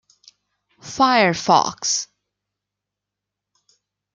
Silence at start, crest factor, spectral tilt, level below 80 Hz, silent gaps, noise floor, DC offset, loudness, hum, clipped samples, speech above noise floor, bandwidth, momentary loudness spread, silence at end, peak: 0.85 s; 22 dB; -2.5 dB/octave; -64 dBFS; none; -84 dBFS; under 0.1%; -18 LUFS; 50 Hz at -55 dBFS; under 0.1%; 67 dB; 10.5 kHz; 15 LU; 2.1 s; -2 dBFS